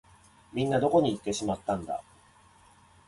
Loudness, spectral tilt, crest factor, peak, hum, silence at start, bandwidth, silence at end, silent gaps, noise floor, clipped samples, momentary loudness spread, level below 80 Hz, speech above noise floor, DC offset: -29 LUFS; -5.5 dB/octave; 18 dB; -12 dBFS; none; 0.55 s; 11.5 kHz; 1.05 s; none; -59 dBFS; under 0.1%; 14 LU; -58 dBFS; 31 dB; under 0.1%